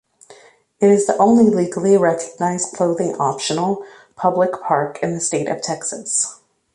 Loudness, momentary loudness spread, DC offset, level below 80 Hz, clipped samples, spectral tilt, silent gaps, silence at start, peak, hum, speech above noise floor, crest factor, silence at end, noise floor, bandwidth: -18 LUFS; 9 LU; under 0.1%; -62 dBFS; under 0.1%; -4.5 dB/octave; none; 0.3 s; -2 dBFS; none; 31 dB; 16 dB; 0.4 s; -48 dBFS; 11.5 kHz